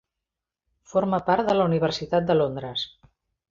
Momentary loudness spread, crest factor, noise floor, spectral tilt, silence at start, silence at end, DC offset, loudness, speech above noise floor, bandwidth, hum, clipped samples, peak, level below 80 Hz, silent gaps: 9 LU; 18 dB; -87 dBFS; -6.5 dB/octave; 0.95 s; 0.65 s; under 0.1%; -24 LUFS; 64 dB; 7.6 kHz; none; under 0.1%; -8 dBFS; -56 dBFS; none